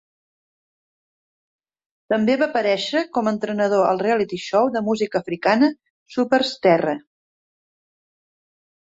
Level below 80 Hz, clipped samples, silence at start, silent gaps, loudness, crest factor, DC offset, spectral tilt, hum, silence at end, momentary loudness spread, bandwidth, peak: -66 dBFS; under 0.1%; 2.1 s; 5.90-6.06 s; -20 LUFS; 18 dB; under 0.1%; -5.5 dB/octave; none; 1.85 s; 6 LU; 8 kHz; -4 dBFS